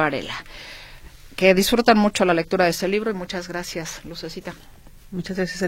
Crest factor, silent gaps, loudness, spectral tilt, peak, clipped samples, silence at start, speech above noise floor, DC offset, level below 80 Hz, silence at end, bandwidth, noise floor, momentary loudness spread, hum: 20 dB; none; -21 LUFS; -4.5 dB/octave; -2 dBFS; under 0.1%; 0 s; 21 dB; under 0.1%; -46 dBFS; 0 s; 16.5 kHz; -42 dBFS; 21 LU; none